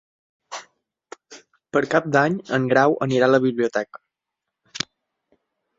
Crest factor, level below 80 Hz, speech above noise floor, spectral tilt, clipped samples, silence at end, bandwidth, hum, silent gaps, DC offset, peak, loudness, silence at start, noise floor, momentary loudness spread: 22 dB; -66 dBFS; 64 dB; -5.5 dB/octave; under 0.1%; 1 s; 7.8 kHz; none; none; under 0.1%; 0 dBFS; -21 LUFS; 0.5 s; -84 dBFS; 19 LU